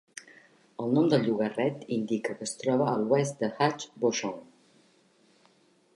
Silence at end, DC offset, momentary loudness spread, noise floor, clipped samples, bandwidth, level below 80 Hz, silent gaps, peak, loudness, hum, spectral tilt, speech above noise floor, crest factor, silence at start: 1.5 s; under 0.1%; 12 LU; -64 dBFS; under 0.1%; 11.5 kHz; -78 dBFS; none; -12 dBFS; -28 LUFS; none; -5.5 dB/octave; 36 dB; 18 dB; 0.15 s